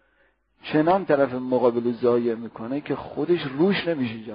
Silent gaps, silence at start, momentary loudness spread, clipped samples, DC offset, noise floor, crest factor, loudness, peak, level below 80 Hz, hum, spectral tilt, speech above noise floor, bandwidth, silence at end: none; 0.65 s; 10 LU; under 0.1%; under 0.1%; -65 dBFS; 18 dB; -23 LUFS; -6 dBFS; -62 dBFS; none; -11 dB/octave; 42 dB; 5.2 kHz; 0 s